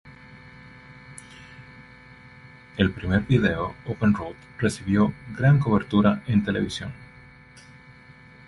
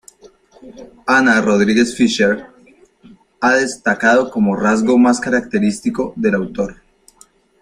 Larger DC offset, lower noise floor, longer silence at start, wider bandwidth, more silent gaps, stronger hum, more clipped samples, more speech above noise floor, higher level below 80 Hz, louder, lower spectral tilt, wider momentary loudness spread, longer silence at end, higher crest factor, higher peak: neither; about the same, -49 dBFS vs -50 dBFS; second, 0.05 s vs 0.25 s; about the same, 11.5 kHz vs 11 kHz; neither; neither; neither; second, 26 dB vs 36 dB; about the same, -46 dBFS vs -50 dBFS; second, -23 LUFS vs -15 LUFS; first, -7 dB/octave vs -5 dB/octave; first, 25 LU vs 9 LU; first, 1.45 s vs 0.9 s; about the same, 20 dB vs 16 dB; second, -4 dBFS vs 0 dBFS